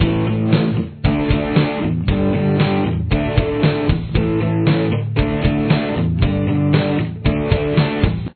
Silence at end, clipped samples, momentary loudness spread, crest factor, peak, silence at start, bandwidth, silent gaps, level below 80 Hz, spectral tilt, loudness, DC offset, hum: 0 s; under 0.1%; 3 LU; 16 dB; 0 dBFS; 0 s; 4.5 kHz; none; -28 dBFS; -11 dB/octave; -18 LUFS; under 0.1%; none